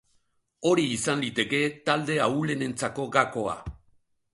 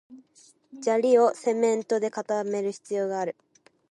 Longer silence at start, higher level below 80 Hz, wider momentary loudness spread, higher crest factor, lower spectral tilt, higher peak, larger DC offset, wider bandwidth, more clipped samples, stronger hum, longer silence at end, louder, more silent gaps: first, 0.6 s vs 0.1 s; first, -54 dBFS vs -80 dBFS; second, 7 LU vs 11 LU; about the same, 22 dB vs 18 dB; about the same, -4.5 dB/octave vs -5 dB/octave; about the same, -6 dBFS vs -8 dBFS; neither; about the same, 11.5 kHz vs 11.5 kHz; neither; neither; about the same, 0.6 s vs 0.6 s; about the same, -26 LUFS vs -26 LUFS; neither